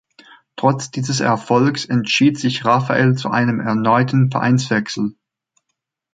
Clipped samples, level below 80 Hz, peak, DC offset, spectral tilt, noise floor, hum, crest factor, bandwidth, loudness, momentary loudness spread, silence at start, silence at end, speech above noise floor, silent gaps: under 0.1%; -60 dBFS; -2 dBFS; under 0.1%; -5.5 dB/octave; -77 dBFS; none; 16 dB; 9.2 kHz; -17 LUFS; 7 LU; 0.55 s; 1.05 s; 60 dB; none